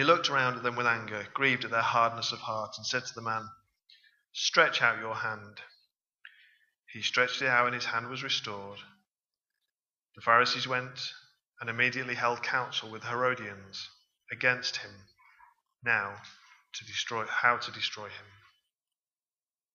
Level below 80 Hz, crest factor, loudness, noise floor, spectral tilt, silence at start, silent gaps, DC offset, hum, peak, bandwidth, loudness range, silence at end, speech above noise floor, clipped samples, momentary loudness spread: -80 dBFS; 26 dB; -29 LUFS; under -90 dBFS; -2.5 dB/octave; 0 s; 6.79-6.83 s; under 0.1%; none; -6 dBFS; 7.4 kHz; 4 LU; 1.5 s; over 59 dB; under 0.1%; 18 LU